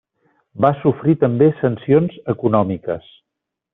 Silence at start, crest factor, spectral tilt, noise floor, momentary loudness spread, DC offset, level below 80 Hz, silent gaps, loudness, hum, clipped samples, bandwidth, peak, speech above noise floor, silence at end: 0.55 s; 16 dB; -8.5 dB/octave; -81 dBFS; 8 LU; under 0.1%; -56 dBFS; none; -17 LUFS; none; under 0.1%; 4 kHz; -2 dBFS; 64 dB; 0.75 s